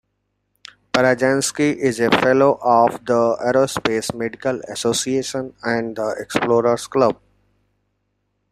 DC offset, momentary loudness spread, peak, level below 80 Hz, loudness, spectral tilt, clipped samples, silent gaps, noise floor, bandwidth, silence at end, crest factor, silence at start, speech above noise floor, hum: under 0.1%; 9 LU; -2 dBFS; -56 dBFS; -19 LUFS; -4 dB/octave; under 0.1%; none; -72 dBFS; 14.5 kHz; 1.35 s; 18 dB; 0.95 s; 54 dB; 50 Hz at -50 dBFS